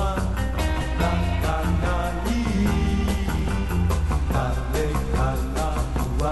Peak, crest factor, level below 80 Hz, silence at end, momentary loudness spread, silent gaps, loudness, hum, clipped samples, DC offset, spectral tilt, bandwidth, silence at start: -8 dBFS; 14 dB; -26 dBFS; 0 s; 3 LU; none; -24 LUFS; none; under 0.1%; under 0.1%; -6.5 dB/octave; 12 kHz; 0 s